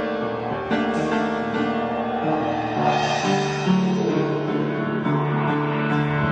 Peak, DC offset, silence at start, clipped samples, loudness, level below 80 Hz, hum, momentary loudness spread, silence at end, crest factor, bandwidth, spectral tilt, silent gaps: -6 dBFS; under 0.1%; 0 s; under 0.1%; -22 LUFS; -52 dBFS; none; 4 LU; 0 s; 14 dB; 8.8 kHz; -6.5 dB/octave; none